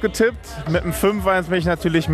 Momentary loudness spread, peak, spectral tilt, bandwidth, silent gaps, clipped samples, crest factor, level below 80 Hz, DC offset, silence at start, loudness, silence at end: 4 LU; -6 dBFS; -5.5 dB/octave; 14.5 kHz; none; under 0.1%; 14 dB; -36 dBFS; under 0.1%; 0 s; -20 LUFS; 0 s